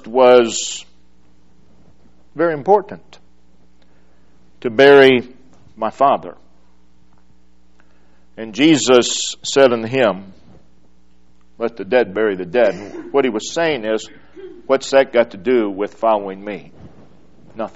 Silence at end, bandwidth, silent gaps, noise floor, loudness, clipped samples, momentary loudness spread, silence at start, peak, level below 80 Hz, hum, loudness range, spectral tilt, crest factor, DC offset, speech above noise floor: 0.1 s; 8.2 kHz; none; -55 dBFS; -15 LUFS; under 0.1%; 19 LU; 0.05 s; 0 dBFS; -56 dBFS; none; 7 LU; -3.5 dB/octave; 18 dB; 0.8%; 40 dB